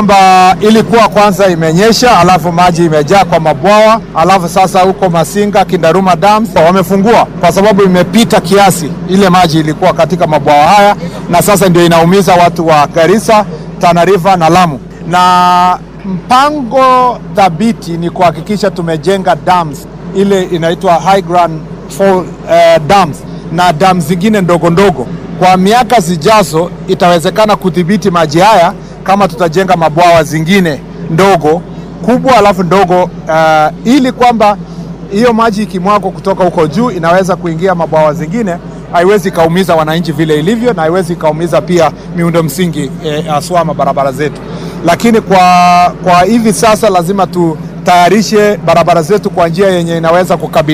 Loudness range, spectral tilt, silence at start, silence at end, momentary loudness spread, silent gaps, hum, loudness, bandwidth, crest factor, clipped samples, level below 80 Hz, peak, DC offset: 4 LU; -5.5 dB/octave; 0 s; 0 s; 8 LU; none; none; -8 LUFS; 16 kHz; 8 dB; 0.7%; -34 dBFS; 0 dBFS; under 0.1%